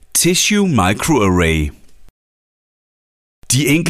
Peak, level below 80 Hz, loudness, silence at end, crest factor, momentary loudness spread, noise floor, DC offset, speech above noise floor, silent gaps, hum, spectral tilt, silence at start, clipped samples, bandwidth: -4 dBFS; -34 dBFS; -14 LUFS; 0 s; 12 dB; 6 LU; under -90 dBFS; under 0.1%; over 76 dB; 2.10-3.42 s; none; -4 dB/octave; 0.15 s; under 0.1%; 16 kHz